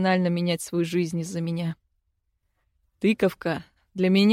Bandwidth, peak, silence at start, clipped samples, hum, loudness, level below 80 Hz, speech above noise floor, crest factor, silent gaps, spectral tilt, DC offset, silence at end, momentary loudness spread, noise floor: 15.5 kHz; -10 dBFS; 0 s; under 0.1%; none; -26 LUFS; -64 dBFS; 51 dB; 16 dB; none; -6 dB/octave; under 0.1%; 0 s; 10 LU; -74 dBFS